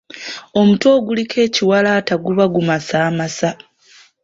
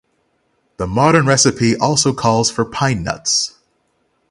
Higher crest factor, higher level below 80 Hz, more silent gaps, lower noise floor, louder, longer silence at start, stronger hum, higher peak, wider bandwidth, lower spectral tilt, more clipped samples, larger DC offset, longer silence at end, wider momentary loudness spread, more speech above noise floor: about the same, 14 dB vs 16 dB; second, -56 dBFS vs -44 dBFS; neither; second, -48 dBFS vs -64 dBFS; about the same, -15 LUFS vs -15 LUFS; second, 0.15 s vs 0.8 s; neither; about the same, -2 dBFS vs 0 dBFS; second, 7.8 kHz vs 11.5 kHz; first, -5.5 dB/octave vs -4 dB/octave; neither; neither; about the same, 0.7 s vs 0.8 s; about the same, 9 LU vs 8 LU; second, 34 dB vs 49 dB